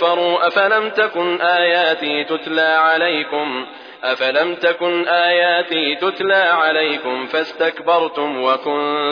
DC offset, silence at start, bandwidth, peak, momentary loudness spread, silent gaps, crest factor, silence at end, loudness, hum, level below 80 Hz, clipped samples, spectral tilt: under 0.1%; 0 s; 5.4 kHz; -4 dBFS; 7 LU; none; 14 dB; 0 s; -16 LUFS; none; -78 dBFS; under 0.1%; -5 dB/octave